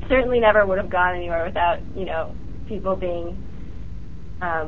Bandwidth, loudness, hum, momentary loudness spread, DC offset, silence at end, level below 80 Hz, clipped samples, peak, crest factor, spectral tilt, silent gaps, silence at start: 6.6 kHz; -22 LUFS; none; 22 LU; 3%; 0 s; -36 dBFS; under 0.1%; -4 dBFS; 18 dB; -4 dB/octave; none; 0 s